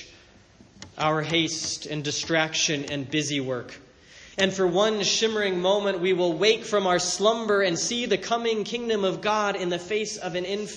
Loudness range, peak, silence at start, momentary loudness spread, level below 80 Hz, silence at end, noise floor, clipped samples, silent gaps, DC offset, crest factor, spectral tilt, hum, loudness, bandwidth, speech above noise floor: 4 LU; -6 dBFS; 0 s; 7 LU; -62 dBFS; 0 s; -53 dBFS; under 0.1%; none; under 0.1%; 18 dB; -3 dB/octave; none; -24 LUFS; 10.5 kHz; 29 dB